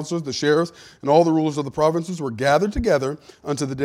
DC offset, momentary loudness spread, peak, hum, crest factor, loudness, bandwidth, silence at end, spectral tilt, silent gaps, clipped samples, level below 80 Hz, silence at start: under 0.1%; 12 LU; -4 dBFS; none; 18 dB; -21 LUFS; 15 kHz; 0 s; -5.5 dB/octave; none; under 0.1%; -42 dBFS; 0 s